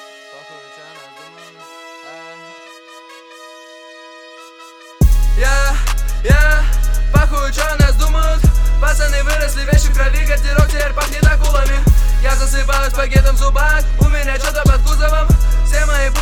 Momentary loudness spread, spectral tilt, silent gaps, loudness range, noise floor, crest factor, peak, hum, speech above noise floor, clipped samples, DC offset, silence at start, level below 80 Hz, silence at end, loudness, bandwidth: 22 LU; -4.5 dB/octave; none; 20 LU; -39 dBFS; 12 dB; 0 dBFS; none; 27 dB; under 0.1%; under 0.1%; 0 s; -14 dBFS; 0 s; -15 LUFS; 15.5 kHz